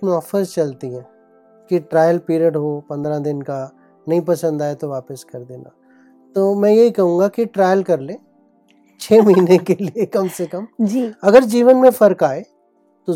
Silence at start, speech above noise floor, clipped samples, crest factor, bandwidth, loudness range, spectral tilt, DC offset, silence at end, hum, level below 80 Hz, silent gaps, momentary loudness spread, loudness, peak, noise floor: 0 s; 42 dB; under 0.1%; 16 dB; 16.5 kHz; 8 LU; -7 dB/octave; under 0.1%; 0 s; none; -64 dBFS; none; 19 LU; -16 LUFS; 0 dBFS; -58 dBFS